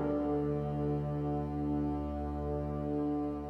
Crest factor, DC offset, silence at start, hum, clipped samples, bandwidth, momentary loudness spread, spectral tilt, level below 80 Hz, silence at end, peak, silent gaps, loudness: 12 dB; under 0.1%; 0 s; none; under 0.1%; 5.2 kHz; 4 LU; -10.5 dB/octave; -46 dBFS; 0 s; -22 dBFS; none; -35 LUFS